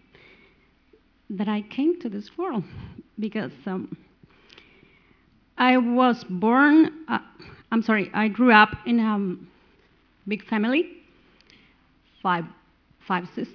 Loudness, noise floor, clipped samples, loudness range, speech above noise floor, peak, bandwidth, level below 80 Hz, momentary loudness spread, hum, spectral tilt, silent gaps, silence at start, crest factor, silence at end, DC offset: -23 LUFS; -60 dBFS; under 0.1%; 10 LU; 38 dB; -2 dBFS; 5.4 kHz; -60 dBFS; 18 LU; none; -7.5 dB/octave; none; 1.3 s; 24 dB; 0.05 s; under 0.1%